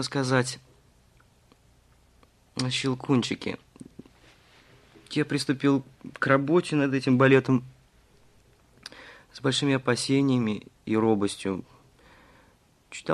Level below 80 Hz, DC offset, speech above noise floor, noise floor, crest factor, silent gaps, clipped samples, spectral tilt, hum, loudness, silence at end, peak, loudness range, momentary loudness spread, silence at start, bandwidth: -64 dBFS; under 0.1%; 36 dB; -61 dBFS; 20 dB; none; under 0.1%; -5.5 dB/octave; none; -25 LUFS; 0 s; -6 dBFS; 7 LU; 21 LU; 0 s; 12 kHz